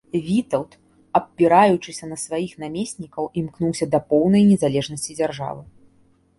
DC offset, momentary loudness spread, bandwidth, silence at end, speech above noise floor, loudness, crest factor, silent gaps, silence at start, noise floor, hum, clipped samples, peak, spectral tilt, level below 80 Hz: under 0.1%; 15 LU; 11.5 kHz; 0.75 s; 38 dB; -21 LUFS; 18 dB; none; 0.15 s; -58 dBFS; none; under 0.1%; -2 dBFS; -6 dB/octave; -56 dBFS